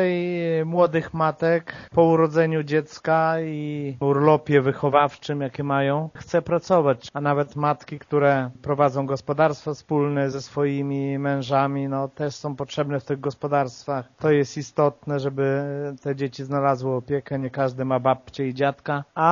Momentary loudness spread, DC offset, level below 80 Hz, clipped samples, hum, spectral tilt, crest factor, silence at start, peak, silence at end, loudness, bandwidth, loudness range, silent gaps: 9 LU; under 0.1%; -60 dBFS; under 0.1%; none; -6 dB/octave; 20 dB; 0 s; -4 dBFS; 0 s; -23 LUFS; 7.2 kHz; 4 LU; none